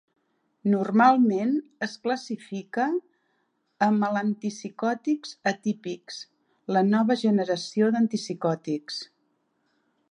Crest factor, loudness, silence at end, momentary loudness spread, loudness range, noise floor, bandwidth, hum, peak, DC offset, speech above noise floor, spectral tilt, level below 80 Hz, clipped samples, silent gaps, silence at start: 20 dB; -26 LUFS; 1.05 s; 13 LU; 3 LU; -73 dBFS; 10 kHz; none; -6 dBFS; under 0.1%; 48 dB; -6 dB/octave; -80 dBFS; under 0.1%; none; 0.65 s